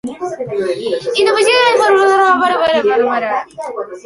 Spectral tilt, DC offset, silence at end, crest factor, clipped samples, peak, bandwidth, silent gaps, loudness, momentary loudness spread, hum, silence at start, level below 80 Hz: -3 dB/octave; under 0.1%; 0.05 s; 12 dB; under 0.1%; 0 dBFS; 11.5 kHz; none; -13 LUFS; 13 LU; none; 0.05 s; -56 dBFS